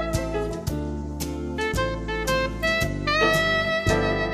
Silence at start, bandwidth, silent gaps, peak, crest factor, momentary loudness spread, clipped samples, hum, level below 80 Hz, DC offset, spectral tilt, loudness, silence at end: 0 s; 16 kHz; none; -8 dBFS; 16 dB; 10 LU; under 0.1%; none; -34 dBFS; under 0.1%; -4.5 dB/octave; -24 LUFS; 0 s